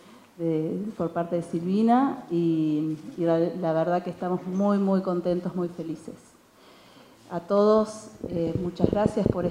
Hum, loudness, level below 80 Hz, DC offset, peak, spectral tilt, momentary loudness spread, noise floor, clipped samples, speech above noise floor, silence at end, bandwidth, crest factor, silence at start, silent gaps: none; -26 LUFS; -54 dBFS; under 0.1%; -4 dBFS; -8 dB/octave; 11 LU; -54 dBFS; under 0.1%; 29 dB; 0 s; 11 kHz; 22 dB; 0.4 s; none